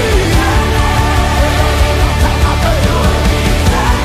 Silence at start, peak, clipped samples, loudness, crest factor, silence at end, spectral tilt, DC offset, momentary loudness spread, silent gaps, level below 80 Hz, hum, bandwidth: 0 s; 0 dBFS; under 0.1%; -12 LUFS; 10 dB; 0 s; -5 dB/octave; under 0.1%; 1 LU; none; -14 dBFS; none; 15.5 kHz